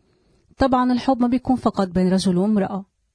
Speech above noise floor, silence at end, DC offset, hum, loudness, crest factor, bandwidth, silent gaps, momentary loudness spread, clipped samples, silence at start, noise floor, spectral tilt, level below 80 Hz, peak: 41 dB; 0.3 s; under 0.1%; none; -20 LUFS; 14 dB; 10.5 kHz; none; 4 LU; under 0.1%; 0.6 s; -60 dBFS; -7 dB/octave; -44 dBFS; -6 dBFS